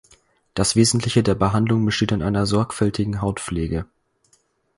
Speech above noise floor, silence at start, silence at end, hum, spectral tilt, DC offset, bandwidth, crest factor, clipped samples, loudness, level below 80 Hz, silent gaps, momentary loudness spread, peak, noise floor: 43 dB; 0.55 s; 0.95 s; none; -5 dB/octave; under 0.1%; 11.5 kHz; 18 dB; under 0.1%; -20 LUFS; -40 dBFS; none; 9 LU; -4 dBFS; -63 dBFS